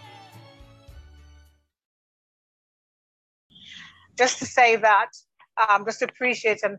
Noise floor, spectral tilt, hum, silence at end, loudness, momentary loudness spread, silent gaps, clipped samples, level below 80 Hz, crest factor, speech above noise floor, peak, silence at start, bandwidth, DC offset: -57 dBFS; -2 dB/octave; none; 0 s; -21 LUFS; 25 LU; 1.85-3.50 s; under 0.1%; -58 dBFS; 20 dB; 36 dB; -6 dBFS; 0.35 s; 8.8 kHz; under 0.1%